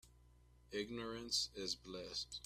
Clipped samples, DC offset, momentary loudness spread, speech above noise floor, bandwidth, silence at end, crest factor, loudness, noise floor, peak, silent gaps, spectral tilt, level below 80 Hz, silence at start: under 0.1%; under 0.1%; 8 LU; 22 dB; 15.5 kHz; 0 s; 22 dB; -43 LUFS; -67 dBFS; -24 dBFS; none; -2 dB/octave; -66 dBFS; 0.05 s